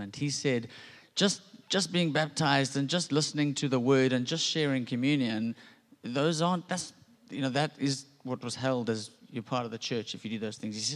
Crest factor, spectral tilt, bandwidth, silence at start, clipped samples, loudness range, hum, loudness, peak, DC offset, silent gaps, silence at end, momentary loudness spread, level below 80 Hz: 20 dB; -4.5 dB/octave; 12 kHz; 0 s; under 0.1%; 6 LU; none; -30 LUFS; -10 dBFS; under 0.1%; none; 0 s; 11 LU; -74 dBFS